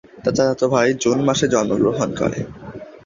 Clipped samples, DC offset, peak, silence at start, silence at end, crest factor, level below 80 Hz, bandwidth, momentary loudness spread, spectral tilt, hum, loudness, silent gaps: under 0.1%; under 0.1%; -2 dBFS; 0.15 s; 0.05 s; 18 dB; -48 dBFS; 7.6 kHz; 13 LU; -5 dB/octave; none; -18 LUFS; none